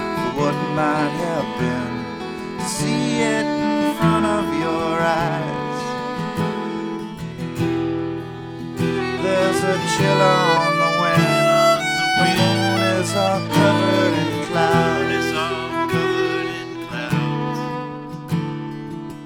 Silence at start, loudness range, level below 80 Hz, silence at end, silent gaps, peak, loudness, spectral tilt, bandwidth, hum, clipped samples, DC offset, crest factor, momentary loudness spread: 0 s; 7 LU; -50 dBFS; 0 s; none; -2 dBFS; -20 LUFS; -5 dB/octave; 19.5 kHz; none; under 0.1%; under 0.1%; 18 dB; 13 LU